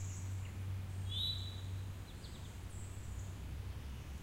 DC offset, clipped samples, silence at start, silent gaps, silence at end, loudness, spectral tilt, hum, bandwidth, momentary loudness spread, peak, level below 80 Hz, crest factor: under 0.1%; under 0.1%; 0 s; none; 0 s; -44 LUFS; -4.5 dB/octave; none; 16 kHz; 11 LU; -28 dBFS; -52 dBFS; 16 dB